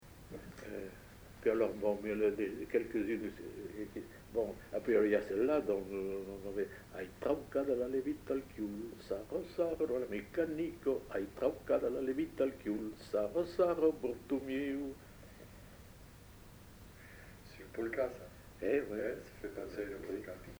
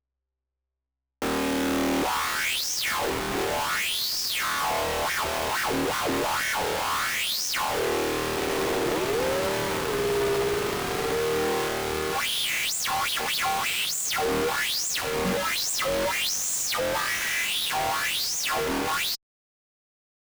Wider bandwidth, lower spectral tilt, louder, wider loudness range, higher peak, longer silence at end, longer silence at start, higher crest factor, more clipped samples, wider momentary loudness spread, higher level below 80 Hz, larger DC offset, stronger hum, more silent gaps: about the same, over 20 kHz vs over 20 kHz; first, -6.5 dB/octave vs -2 dB/octave; second, -38 LUFS vs -25 LUFS; first, 8 LU vs 1 LU; about the same, -20 dBFS vs -20 dBFS; second, 0 s vs 1.05 s; second, 0 s vs 1.2 s; first, 18 dB vs 6 dB; neither; first, 21 LU vs 2 LU; second, -60 dBFS vs -50 dBFS; neither; neither; neither